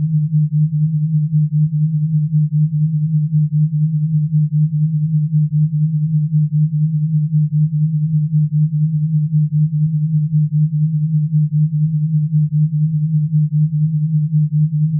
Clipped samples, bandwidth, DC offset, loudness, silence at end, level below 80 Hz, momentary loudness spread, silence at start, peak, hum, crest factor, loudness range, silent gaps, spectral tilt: under 0.1%; 0.3 kHz; under 0.1%; -16 LUFS; 0 s; -56 dBFS; 2 LU; 0 s; -8 dBFS; none; 8 dB; 0 LU; none; -30.5 dB/octave